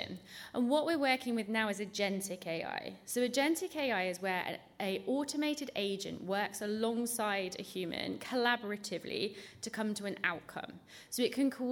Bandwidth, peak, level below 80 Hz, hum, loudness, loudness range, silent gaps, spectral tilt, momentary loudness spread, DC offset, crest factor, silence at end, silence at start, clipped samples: 18 kHz; -16 dBFS; -78 dBFS; none; -35 LUFS; 2 LU; none; -3.5 dB/octave; 10 LU; under 0.1%; 20 dB; 0 s; 0 s; under 0.1%